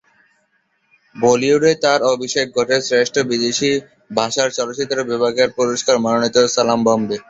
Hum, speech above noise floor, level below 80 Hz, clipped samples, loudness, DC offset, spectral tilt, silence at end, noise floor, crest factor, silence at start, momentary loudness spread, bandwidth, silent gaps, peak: none; 48 dB; -58 dBFS; under 0.1%; -17 LUFS; under 0.1%; -3.5 dB/octave; 0.1 s; -64 dBFS; 16 dB; 1.15 s; 6 LU; 8 kHz; none; 0 dBFS